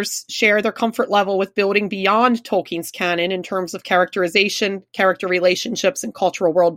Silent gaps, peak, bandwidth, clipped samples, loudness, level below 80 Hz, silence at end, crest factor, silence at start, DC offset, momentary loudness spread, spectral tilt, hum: none; -2 dBFS; 16.5 kHz; under 0.1%; -18 LUFS; -68 dBFS; 0 s; 18 dB; 0 s; under 0.1%; 6 LU; -3.5 dB/octave; none